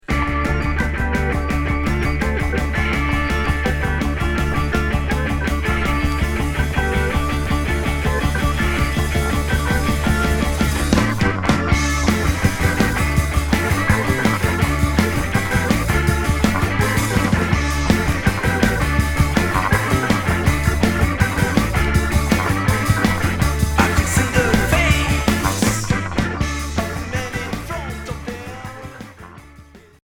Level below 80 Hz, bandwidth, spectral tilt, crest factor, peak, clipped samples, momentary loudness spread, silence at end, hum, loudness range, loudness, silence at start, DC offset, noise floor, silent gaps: -24 dBFS; 18.5 kHz; -5 dB/octave; 18 dB; 0 dBFS; under 0.1%; 5 LU; 0.25 s; none; 3 LU; -19 LUFS; 0.1 s; under 0.1%; -44 dBFS; none